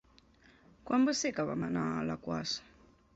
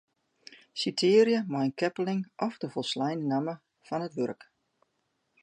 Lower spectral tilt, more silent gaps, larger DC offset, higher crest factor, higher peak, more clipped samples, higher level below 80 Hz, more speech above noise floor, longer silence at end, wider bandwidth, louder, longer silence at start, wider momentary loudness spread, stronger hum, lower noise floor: about the same, -4.5 dB/octave vs -5.5 dB/octave; neither; neither; about the same, 16 dB vs 20 dB; second, -20 dBFS vs -10 dBFS; neither; first, -64 dBFS vs -80 dBFS; second, 30 dB vs 49 dB; second, 0.55 s vs 1.1 s; second, 8 kHz vs 10.5 kHz; second, -34 LUFS vs -29 LUFS; first, 0.85 s vs 0.5 s; second, 8 LU vs 14 LU; neither; second, -63 dBFS vs -77 dBFS